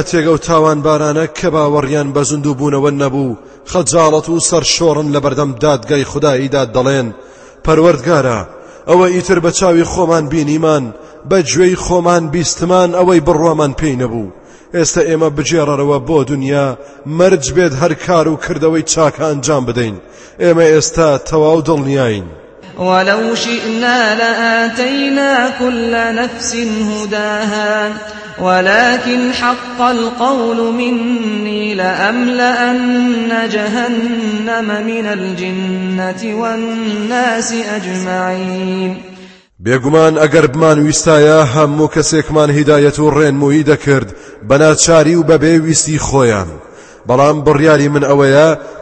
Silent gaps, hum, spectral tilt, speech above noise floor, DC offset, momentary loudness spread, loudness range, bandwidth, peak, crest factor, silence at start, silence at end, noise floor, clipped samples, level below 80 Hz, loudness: none; none; -4.5 dB/octave; 25 dB; under 0.1%; 9 LU; 5 LU; 8.8 kHz; 0 dBFS; 12 dB; 0 s; 0 s; -37 dBFS; under 0.1%; -38 dBFS; -12 LUFS